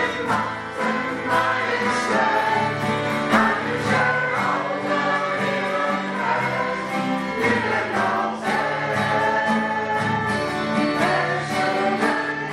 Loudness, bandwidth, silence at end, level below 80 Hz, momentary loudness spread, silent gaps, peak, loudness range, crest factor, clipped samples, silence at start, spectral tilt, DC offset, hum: -21 LUFS; 14.5 kHz; 0 s; -58 dBFS; 4 LU; none; -2 dBFS; 2 LU; 20 dB; under 0.1%; 0 s; -5 dB/octave; under 0.1%; none